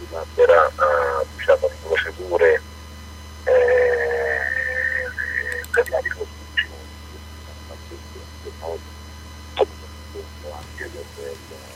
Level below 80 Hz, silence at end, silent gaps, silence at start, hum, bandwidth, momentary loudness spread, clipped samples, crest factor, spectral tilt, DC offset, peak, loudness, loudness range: -40 dBFS; 0 s; none; 0 s; none; 15 kHz; 22 LU; under 0.1%; 20 dB; -4 dB/octave; under 0.1%; -2 dBFS; -20 LUFS; 12 LU